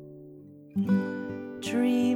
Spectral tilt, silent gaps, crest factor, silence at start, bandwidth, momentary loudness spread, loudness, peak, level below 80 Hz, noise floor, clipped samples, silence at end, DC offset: -6.5 dB/octave; none; 14 dB; 0 s; 13.5 kHz; 22 LU; -29 LUFS; -14 dBFS; -68 dBFS; -48 dBFS; under 0.1%; 0 s; under 0.1%